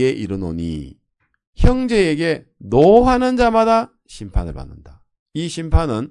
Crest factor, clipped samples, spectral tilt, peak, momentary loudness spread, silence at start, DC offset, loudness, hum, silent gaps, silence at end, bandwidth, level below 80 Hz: 16 dB; under 0.1%; -7 dB/octave; 0 dBFS; 19 LU; 0 s; under 0.1%; -17 LUFS; none; 1.47-1.53 s, 5.19-5.26 s; 0.05 s; 11 kHz; -26 dBFS